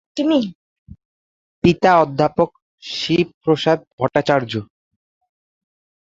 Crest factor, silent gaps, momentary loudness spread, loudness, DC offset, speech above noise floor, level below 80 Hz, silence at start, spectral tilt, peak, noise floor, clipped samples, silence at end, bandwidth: 20 dB; 0.55-0.86 s, 1.05-1.62 s, 2.62-2.78 s, 3.34-3.41 s, 3.87-3.98 s; 13 LU; -18 LUFS; under 0.1%; over 73 dB; -50 dBFS; 0.15 s; -6.5 dB/octave; 0 dBFS; under -90 dBFS; under 0.1%; 1.5 s; 7.8 kHz